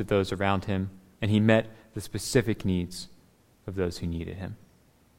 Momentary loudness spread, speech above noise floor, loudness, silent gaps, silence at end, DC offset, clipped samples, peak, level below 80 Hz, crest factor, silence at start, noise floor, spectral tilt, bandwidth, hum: 17 LU; 34 dB; -28 LUFS; none; 0.6 s; under 0.1%; under 0.1%; -6 dBFS; -52 dBFS; 22 dB; 0 s; -61 dBFS; -6 dB/octave; 16 kHz; none